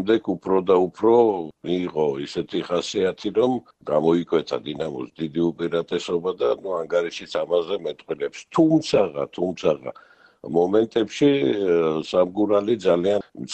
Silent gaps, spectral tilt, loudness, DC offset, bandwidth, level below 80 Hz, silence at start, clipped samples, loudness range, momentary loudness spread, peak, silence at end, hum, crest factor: none; -6 dB/octave; -22 LUFS; under 0.1%; 8.6 kHz; -60 dBFS; 0 s; under 0.1%; 4 LU; 10 LU; -6 dBFS; 0 s; none; 16 dB